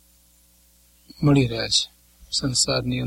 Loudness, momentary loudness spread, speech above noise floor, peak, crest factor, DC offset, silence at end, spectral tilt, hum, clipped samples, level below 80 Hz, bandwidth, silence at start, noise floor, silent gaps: -21 LUFS; 7 LU; 36 dB; -6 dBFS; 18 dB; under 0.1%; 0 s; -4 dB/octave; 60 Hz at -50 dBFS; under 0.1%; -46 dBFS; 16 kHz; 1.2 s; -57 dBFS; none